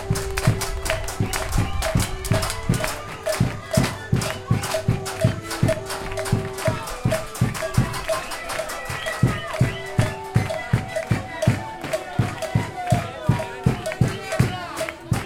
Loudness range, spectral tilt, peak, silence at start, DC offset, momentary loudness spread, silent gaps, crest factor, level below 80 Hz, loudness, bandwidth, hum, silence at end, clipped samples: 1 LU; -5.5 dB/octave; -4 dBFS; 0 s; under 0.1%; 5 LU; none; 20 dB; -36 dBFS; -24 LUFS; 17 kHz; none; 0 s; under 0.1%